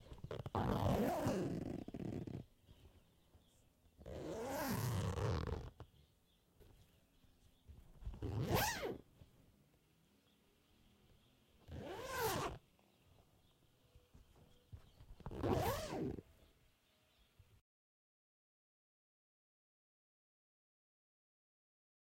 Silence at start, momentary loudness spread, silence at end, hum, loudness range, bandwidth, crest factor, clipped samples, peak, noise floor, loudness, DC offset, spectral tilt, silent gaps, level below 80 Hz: 0 s; 20 LU; 5.7 s; none; 7 LU; 16.5 kHz; 24 dB; under 0.1%; -24 dBFS; -76 dBFS; -42 LUFS; under 0.1%; -5.5 dB/octave; none; -60 dBFS